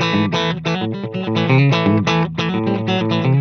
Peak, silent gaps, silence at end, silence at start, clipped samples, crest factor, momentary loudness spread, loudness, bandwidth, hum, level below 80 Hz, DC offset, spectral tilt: -2 dBFS; none; 0 s; 0 s; under 0.1%; 14 dB; 7 LU; -17 LUFS; 6.8 kHz; none; -50 dBFS; under 0.1%; -6.5 dB/octave